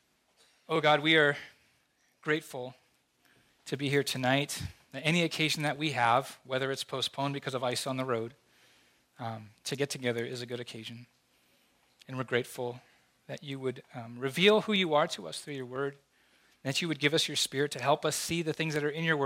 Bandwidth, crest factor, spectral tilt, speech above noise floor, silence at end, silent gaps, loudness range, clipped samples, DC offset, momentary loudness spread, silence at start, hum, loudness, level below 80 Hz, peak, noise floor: 16 kHz; 22 dB; -4 dB/octave; 40 dB; 0 s; none; 8 LU; under 0.1%; under 0.1%; 16 LU; 0.7 s; none; -31 LUFS; -70 dBFS; -10 dBFS; -71 dBFS